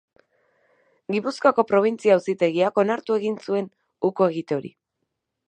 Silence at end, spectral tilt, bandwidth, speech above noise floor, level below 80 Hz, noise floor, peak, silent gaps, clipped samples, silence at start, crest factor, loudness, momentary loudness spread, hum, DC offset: 0.8 s; -6.5 dB/octave; 9.4 kHz; 58 dB; -76 dBFS; -79 dBFS; -4 dBFS; none; under 0.1%; 1.1 s; 20 dB; -22 LUFS; 10 LU; none; under 0.1%